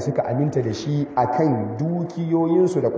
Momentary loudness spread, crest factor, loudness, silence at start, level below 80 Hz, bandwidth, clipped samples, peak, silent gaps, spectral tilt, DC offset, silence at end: 6 LU; 14 dB; -22 LUFS; 0 s; -56 dBFS; 8 kHz; under 0.1%; -6 dBFS; none; -8 dB/octave; under 0.1%; 0 s